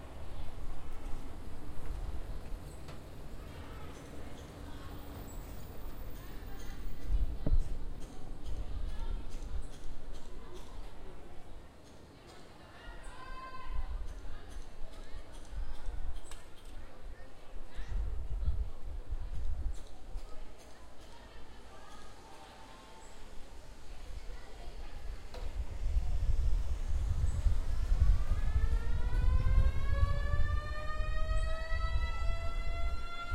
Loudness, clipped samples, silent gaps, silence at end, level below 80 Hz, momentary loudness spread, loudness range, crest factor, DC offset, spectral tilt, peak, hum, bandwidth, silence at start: -41 LUFS; under 0.1%; none; 0 s; -36 dBFS; 19 LU; 17 LU; 18 dB; under 0.1%; -6 dB/octave; -14 dBFS; none; 15.5 kHz; 0 s